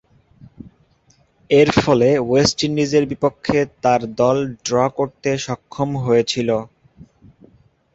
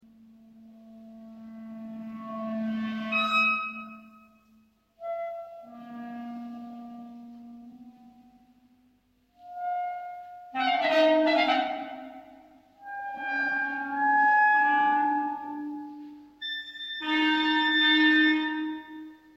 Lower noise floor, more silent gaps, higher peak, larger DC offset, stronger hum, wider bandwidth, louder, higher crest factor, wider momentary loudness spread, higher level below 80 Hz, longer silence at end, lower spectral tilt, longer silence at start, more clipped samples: second, -57 dBFS vs -67 dBFS; neither; first, 0 dBFS vs -10 dBFS; neither; neither; about the same, 8.2 kHz vs 8 kHz; first, -18 LUFS vs -25 LUFS; about the same, 20 dB vs 18 dB; second, 8 LU vs 24 LU; first, -48 dBFS vs -74 dBFS; first, 1.3 s vs 0.2 s; about the same, -5 dB/octave vs -4 dB/octave; about the same, 0.6 s vs 0.55 s; neither